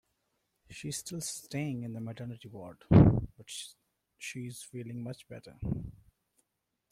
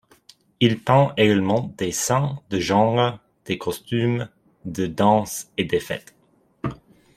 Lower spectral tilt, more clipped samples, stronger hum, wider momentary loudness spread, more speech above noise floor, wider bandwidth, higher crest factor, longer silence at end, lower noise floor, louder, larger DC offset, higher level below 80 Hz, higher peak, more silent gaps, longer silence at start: first, -6.5 dB/octave vs -5 dB/octave; neither; neither; first, 23 LU vs 14 LU; first, 49 dB vs 33 dB; about the same, 15.5 kHz vs 16 kHz; first, 26 dB vs 20 dB; first, 1 s vs 0.4 s; first, -83 dBFS vs -54 dBFS; second, -32 LUFS vs -22 LUFS; neither; first, -48 dBFS vs -54 dBFS; second, -6 dBFS vs -2 dBFS; neither; about the same, 0.7 s vs 0.6 s